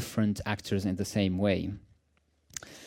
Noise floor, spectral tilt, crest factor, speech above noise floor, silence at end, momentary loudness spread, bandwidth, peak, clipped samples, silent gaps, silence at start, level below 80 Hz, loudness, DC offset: -71 dBFS; -5.5 dB/octave; 18 dB; 42 dB; 0 s; 16 LU; 17 kHz; -14 dBFS; under 0.1%; none; 0 s; -60 dBFS; -30 LUFS; under 0.1%